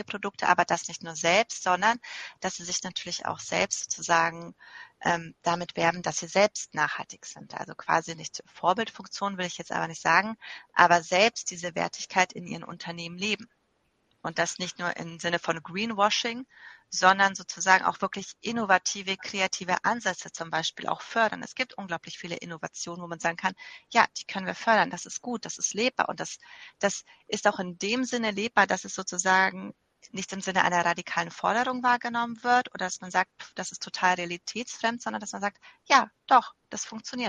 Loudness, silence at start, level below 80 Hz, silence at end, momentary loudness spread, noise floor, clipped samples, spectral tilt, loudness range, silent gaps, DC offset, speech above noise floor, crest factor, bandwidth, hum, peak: -27 LUFS; 0 s; -70 dBFS; 0 s; 14 LU; -72 dBFS; under 0.1%; -2.5 dB/octave; 5 LU; none; under 0.1%; 44 dB; 26 dB; 10 kHz; none; -2 dBFS